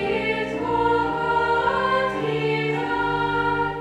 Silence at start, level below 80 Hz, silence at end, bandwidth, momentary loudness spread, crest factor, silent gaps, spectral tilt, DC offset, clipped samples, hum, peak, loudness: 0 s; -46 dBFS; 0 s; 11 kHz; 3 LU; 14 dB; none; -6.5 dB/octave; under 0.1%; under 0.1%; none; -10 dBFS; -22 LUFS